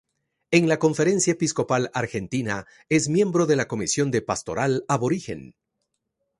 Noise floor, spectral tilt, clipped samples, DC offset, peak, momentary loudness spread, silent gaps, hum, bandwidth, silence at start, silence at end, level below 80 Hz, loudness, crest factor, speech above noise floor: -78 dBFS; -5 dB/octave; under 0.1%; under 0.1%; -4 dBFS; 8 LU; none; none; 11.5 kHz; 0.5 s; 0.95 s; -58 dBFS; -23 LUFS; 20 dB; 55 dB